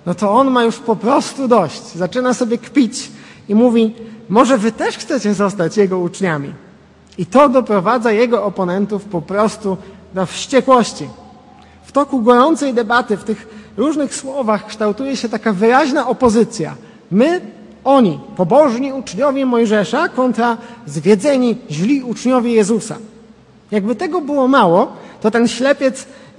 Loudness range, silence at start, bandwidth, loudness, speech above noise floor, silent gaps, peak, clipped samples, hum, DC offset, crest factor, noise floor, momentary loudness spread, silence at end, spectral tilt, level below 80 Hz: 2 LU; 0.05 s; 11.5 kHz; -15 LUFS; 29 dB; none; 0 dBFS; under 0.1%; none; under 0.1%; 16 dB; -44 dBFS; 11 LU; 0.25 s; -5.5 dB/octave; -56 dBFS